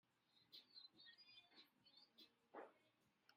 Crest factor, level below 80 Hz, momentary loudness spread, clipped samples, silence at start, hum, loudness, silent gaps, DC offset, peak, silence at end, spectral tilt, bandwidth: 24 dB; under -90 dBFS; 6 LU; under 0.1%; 0.05 s; none; -65 LUFS; none; under 0.1%; -46 dBFS; 0 s; -3 dB/octave; 15 kHz